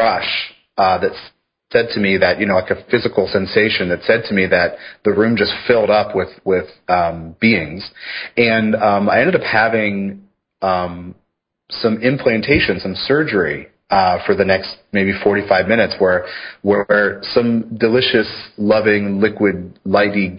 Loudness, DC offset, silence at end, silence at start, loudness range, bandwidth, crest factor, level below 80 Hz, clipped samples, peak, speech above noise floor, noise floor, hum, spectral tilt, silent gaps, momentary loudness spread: -16 LUFS; under 0.1%; 0 s; 0 s; 2 LU; 5.4 kHz; 16 dB; -44 dBFS; under 0.1%; 0 dBFS; 42 dB; -58 dBFS; none; -10.5 dB/octave; none; 8 LU